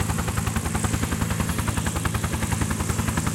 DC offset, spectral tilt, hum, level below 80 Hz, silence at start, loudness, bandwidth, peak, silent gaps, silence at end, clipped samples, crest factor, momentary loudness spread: under 0.1%; -4.5 dB/octave; none; -34 dBFS; 0 s; -25 LUFS; 17 kHz; -8 dBFS; none; 0 s; under 0.1%; 16 dB; 1 LU